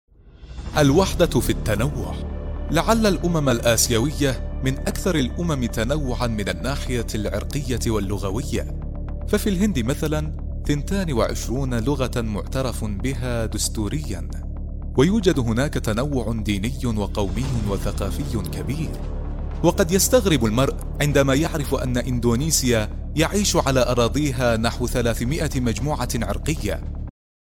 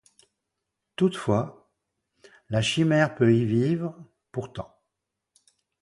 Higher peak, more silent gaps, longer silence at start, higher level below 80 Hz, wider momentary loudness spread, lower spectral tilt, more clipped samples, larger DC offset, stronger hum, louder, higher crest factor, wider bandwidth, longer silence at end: first, -4 dBFS vs -8 dBFS; neither; second, 0.25 s vs 1 s; first, -28 dBFS vs -58 dBFS; second, 11 LU vs 17 LU; second, -5 dB/octave vs -6.5 dB/octave; neither; neither; neither; first, -22 LUFS vs -25 LUFS; about the same, 18 dB vs 20 dB; first, 17 kHz vs 11.5 kHz; second, 0.3 s vs 1.15 s